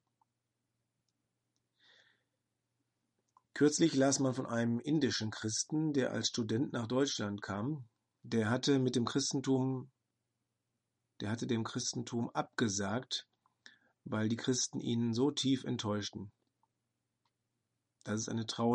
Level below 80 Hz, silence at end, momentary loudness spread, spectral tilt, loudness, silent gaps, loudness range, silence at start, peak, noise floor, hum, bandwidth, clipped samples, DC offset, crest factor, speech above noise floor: -78 dBFS; 0 s; 10 LU; -4.5 dB/octave; -35 LUFS; none; 5 LU; 3.55 s; -16 dBFS; -86 dBFS; none; 10.5 kHz; under 0.1%; under 0.1%; 20 dB; 52 dB